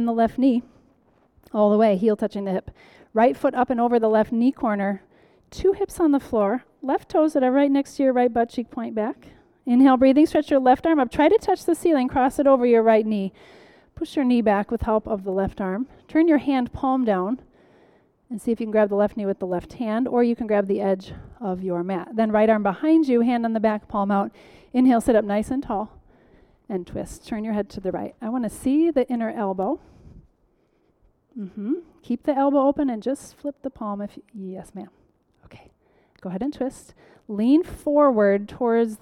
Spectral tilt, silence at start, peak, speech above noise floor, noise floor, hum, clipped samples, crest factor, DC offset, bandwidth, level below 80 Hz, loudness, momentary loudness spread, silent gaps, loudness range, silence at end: -7 dB/octave; 0 s; -6 dBFS; 43 dB; -65 dBFS; none; under 0.1%; 16 dB; under 0.1%; 13.5 kHz; -50 dBFS; -22 LUFS; 14 LU; none; 8 LU; 0.05 s